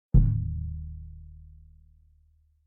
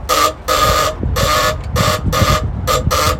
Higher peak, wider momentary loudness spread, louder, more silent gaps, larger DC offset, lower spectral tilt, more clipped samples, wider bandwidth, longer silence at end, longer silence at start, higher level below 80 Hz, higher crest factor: second, -8 dBFS vs -2 dBFS; first, 26 LU vs 4 LU; second, -29 LUFS vs -15 LUFS; neither; neither; first, -15 dB/octave vs -3.5 dB/octave; neither; second, 1.5 kHz vs 17 kHz; first, 1.25 s vs 0 s; first, 0.15 s vs 0 s; second, -32 dBFS vs -24 dBFS; first, 20 dB vs 14 dB